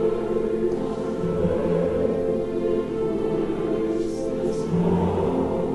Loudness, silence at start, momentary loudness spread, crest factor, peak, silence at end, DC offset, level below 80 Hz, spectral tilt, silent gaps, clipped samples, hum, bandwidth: -24 LUFS; 0 s; 4 LU; 14 dB; -10 dBFS; 0 s; under 0.1%; -44 dBFS; -8.5 dB/octave; none; under 0.1%; none; 11.5 kHz